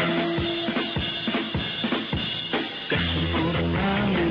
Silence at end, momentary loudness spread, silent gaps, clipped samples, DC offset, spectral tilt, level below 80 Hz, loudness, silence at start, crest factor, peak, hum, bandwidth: 0 s; 3 LU; none; under 0.1%; under 0.1%; -7.5 dB/octave; -42 dBFS; -25 LUFS; 0 s; 12 dB; -12 dBFS; none; 5.4 kHz